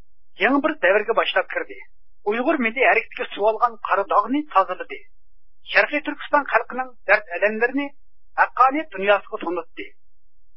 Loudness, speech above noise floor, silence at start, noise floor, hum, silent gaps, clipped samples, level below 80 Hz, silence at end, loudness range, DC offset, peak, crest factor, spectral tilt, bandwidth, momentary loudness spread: -21 LUFS; 37 dB; 0.4 s; -59 dBFS; none; none; under 0.1%; -62 dBFS; 0.7 s; 1 LU; 1%; -2 dBFS; 20 dB; -8 dB/octave; 5.8 kHz; 13 LU